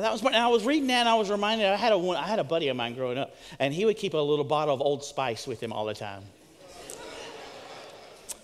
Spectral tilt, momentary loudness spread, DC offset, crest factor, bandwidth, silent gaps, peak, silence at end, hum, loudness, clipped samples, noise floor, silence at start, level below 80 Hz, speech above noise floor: -4 dB/octave; 20 LU; under 0.1%; 20 dB; 15 kHz; none; -8 dBFS; 0.05 s; none; -26 LUFS; under 0.1%; -49 dBFS; 0 s; -66 dBFS; 22 dB